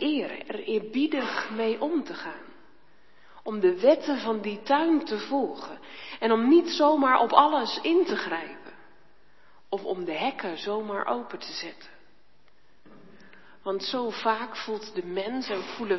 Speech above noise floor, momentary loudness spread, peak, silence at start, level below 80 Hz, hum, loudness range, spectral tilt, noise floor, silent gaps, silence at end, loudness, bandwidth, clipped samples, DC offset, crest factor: 38 dB; 16 LU; -2 dBFS; 0 s; -74 dBFS; none; 10 LU; -5 dB/octave; -65 dBFS; none; 0 s; -26 LUFS; 6.2 kHz; under 0.1%; 0.3%; 26 dB